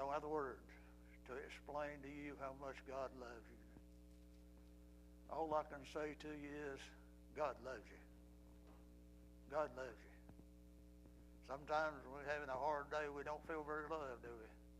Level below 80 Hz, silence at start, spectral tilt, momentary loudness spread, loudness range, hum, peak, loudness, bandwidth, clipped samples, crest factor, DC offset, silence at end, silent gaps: -66 dBFS; 0 s; -5.5 dB/octave; 21 LU; 8 LU; 60 Hz at -65 dBFS; -28 dBFS; -48 LUFS; 15 kHz; under 0.1%; 22 dB; under 0.1%; 0 s; none